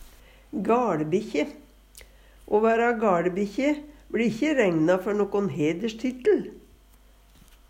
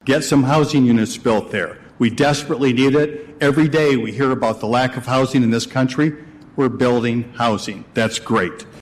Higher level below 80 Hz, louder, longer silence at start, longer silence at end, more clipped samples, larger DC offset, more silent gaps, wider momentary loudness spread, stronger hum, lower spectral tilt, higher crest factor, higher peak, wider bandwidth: about the same, -54 dBFS vs -50 dBFS; second, -25 LUFS vs -18 LUFS; about the same, 0 s vs 0.05 s; first, 1.1 s vs 0 s; neither; neither; neither; about the same, 9 LU vs 8 LU; neither; about the same, -6.5 dB/octave vs -5.5 dB/octave; about the same, 16 dB vs 12 dB; second, -10 dBFS vs -6 dBFS; first, 16 kHz vs 14 kHz